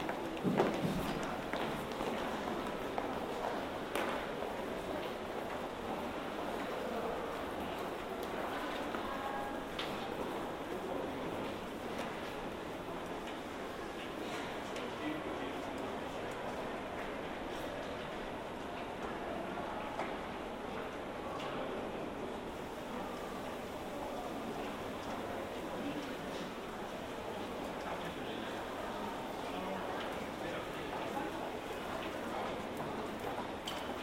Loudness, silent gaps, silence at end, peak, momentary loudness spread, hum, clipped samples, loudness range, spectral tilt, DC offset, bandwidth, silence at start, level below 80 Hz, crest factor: -41 LUFS; none; 0 s; -16 dBFS; 4 LU; none; under 0.1%; 3 LU; -5 dB/octave; under 0.1%; 16 kHz; 0 s; -58 dBFS; 24 dB